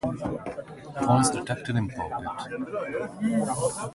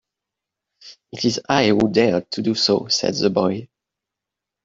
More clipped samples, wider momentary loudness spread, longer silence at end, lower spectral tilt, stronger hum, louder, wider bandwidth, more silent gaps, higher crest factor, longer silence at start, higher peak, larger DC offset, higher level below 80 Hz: neither; first, 12 LU vs 7 LU; second, 0 s vs 1 s; about the same, -5.5 dB/octave vs -4.5 dB/octave; neither; second, -28 LUFS vs -19 LUFS; first, 11.5 kHz vs 7.8 kHz; neither; about the same, 20 dB vs 20 dB; second, 0.05 s vs 0.85 s; second, -8 dBFS vs -2 dBFS; neither; first, -52 dBFS vs -58 dBFS